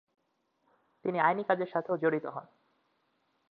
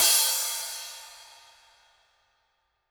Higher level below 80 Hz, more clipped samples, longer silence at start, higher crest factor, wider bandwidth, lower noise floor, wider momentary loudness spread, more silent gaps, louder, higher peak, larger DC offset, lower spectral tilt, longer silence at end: second, -84 dBFS vs -74 dBFS; neither; first, 1.05 s vs 0 s; about the same, 22 dB vs 24 dB; second, 5 kHz vs over 20 kHz; about the same, -77 dBFS vs -74 dBFS; second, 12 LU vs 25 LU; neither; second, -31 LUFS vs -24 LUFS; second, -12 dBFS vs -8 dBFS; neither; first, -9.5 dB/octave vs 4 dB/octave; second, 1.05 s vs 1.65 s